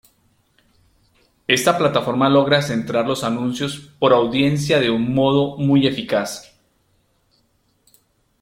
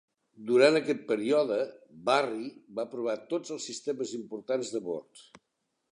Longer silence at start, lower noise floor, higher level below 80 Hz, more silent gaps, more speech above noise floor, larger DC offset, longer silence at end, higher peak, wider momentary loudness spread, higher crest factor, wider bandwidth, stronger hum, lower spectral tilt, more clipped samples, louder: first, 1.5 s vs 0.4 s; second, -63 dBFS vs -81 dBFS; first, -54 dBFS vs -82 dBFS; neither; second, 46 dB vs 51 dB; neither; first, 2 s vs 0.75 s; first, 0 dBFS vs -8 dBFS; second, 8 LU vs 15 LU; about the same, 20 dB vs 22 dB; first, 16.5 kHz vs 10.5 kHz; neither; first, -5.5 dB/octave vs -4 dB/octave; neither; first, -18 LUFS vs -30 LUFS